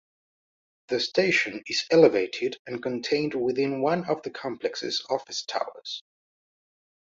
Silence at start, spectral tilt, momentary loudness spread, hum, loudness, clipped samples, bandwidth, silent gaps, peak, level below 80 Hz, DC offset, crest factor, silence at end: 0.9 s; -4 dB/octave; 13 LU; none; -26 LUFS; under 0.1%; 7.8 kHz; 2.59-2.65 s; -4 dBFS; -70 dBFS; under 0.1%; 22 dB; 1.05 s